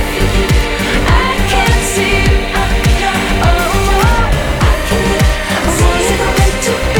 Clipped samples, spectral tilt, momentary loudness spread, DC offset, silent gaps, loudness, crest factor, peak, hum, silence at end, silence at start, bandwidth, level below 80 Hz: under 0.1%; -4.5 dB/octave; 2 LU; under 0.1%; none; -12 LUFS; 10 dB; -2 dBFS; none; 0 s; 0 s; 20 kHz; -16 dBFS